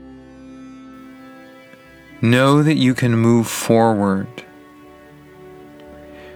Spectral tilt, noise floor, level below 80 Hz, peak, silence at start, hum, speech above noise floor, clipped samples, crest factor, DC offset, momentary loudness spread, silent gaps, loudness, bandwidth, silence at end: -6 dB/octave; -44 dBFS; -56 dBFS; -2 dBFS; 0.05 s; none; 29 dB; under 0.1%; 18 dB; under 0.1%; 26 LU; none; -16 LUFS; 18 kHz; 0 s